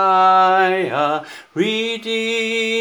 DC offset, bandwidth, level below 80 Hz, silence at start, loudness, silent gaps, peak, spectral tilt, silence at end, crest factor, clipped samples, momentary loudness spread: under 0.1%; over 20 kHz; -78 dBFS; 0 s; -17 LUFS; none; -2 dBFS; -4 dB/octave; 0 s; 14 dB; under 0.1%; 9 LU